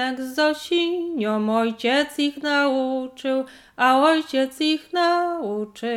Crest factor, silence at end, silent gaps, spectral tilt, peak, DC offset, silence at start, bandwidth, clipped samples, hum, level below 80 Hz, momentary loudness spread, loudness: 16 dB; 0 s; none; -4 dB/octave; -4 dBFS; under 0.1%; 0 s; 16.5 kHz; under 0.1%; none; -68 dBFS; 8 LU; -22 LUFS